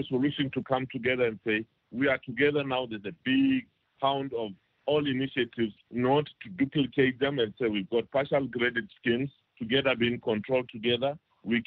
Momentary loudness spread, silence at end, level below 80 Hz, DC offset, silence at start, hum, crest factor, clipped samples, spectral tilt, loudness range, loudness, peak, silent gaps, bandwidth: 7 LU; 0.05 s; -64 dBFS; under 0.1%; 0 s; none; 18 dB; under 0.1%; -9 dB/octave; 1 LU; -29 LUFS; -12 dBFS; none; 4.6 kHz